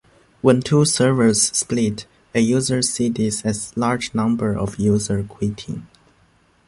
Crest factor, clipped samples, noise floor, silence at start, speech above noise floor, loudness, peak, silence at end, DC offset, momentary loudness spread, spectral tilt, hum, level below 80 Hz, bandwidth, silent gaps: 18 dB; under 0.1%; -57 dBFS; 0.45 s; 38 dB; -19 LUFS; -2 dBFS; 0.8 s; under 0.1%; 10 LU; -4.5 dB/octave; none; -46 dBFS; 11.5 kHz; none